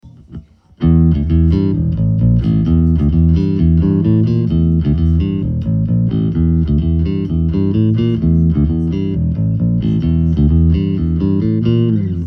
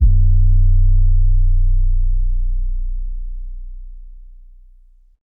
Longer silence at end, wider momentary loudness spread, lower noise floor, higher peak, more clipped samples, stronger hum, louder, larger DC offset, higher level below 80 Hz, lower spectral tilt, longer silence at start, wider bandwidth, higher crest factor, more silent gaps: second, 0 s vs 1.05 s; second, 4 LU vs 20 LU; second, -35 dBFS vs -46 dBFS; about the same, -2 dBFS vs -4 dBFS; neither; neither; first, -14 LUFS vs -19 LUFS; neither; second, -22 dBFS vs -14 dBFS; second, -11.5 dB/octave vs -15 dB/octave; about the same, 0.05 s vs 0 s; first, 5 kHz vs 0.4 kHz; about the same, 12 dB vs 10 dB; neither